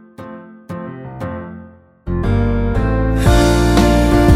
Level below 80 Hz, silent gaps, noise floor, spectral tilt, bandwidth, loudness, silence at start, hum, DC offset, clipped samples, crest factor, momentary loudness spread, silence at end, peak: -20 dBFS; none; -39 dBFS; -6.5 dB/octave; 15 kHz; -15 LUFS; 0.2 s; none; under 0.1%; under 0.1%; 14 dB; 22 LU; 0 s; 0 dBFS